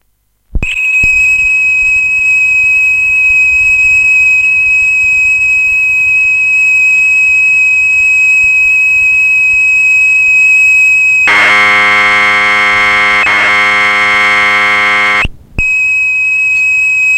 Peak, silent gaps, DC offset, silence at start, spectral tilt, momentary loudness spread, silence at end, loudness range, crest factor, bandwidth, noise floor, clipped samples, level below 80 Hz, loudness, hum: 0 dBFS; none; under 0.1%; 0.55 s; -1.5 dB/octave; 3 LU; 0 s; 3 LU; 8 dB; 13.5 kHz; -56 dBFS; under 0.1%; -32 dBFS; -5 LUFS; none